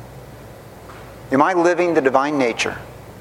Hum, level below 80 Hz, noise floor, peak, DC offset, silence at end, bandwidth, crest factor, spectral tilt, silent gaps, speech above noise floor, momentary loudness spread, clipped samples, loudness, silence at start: none; -50 dBFS; -39 dBFS; 0 dBFS; under 0.1%; 0 s; 16.5 kHz; 20 dB; -5 dB/octave; none; 22 dB; 23 LU; under 0.1%; -18 LUFS; 0 s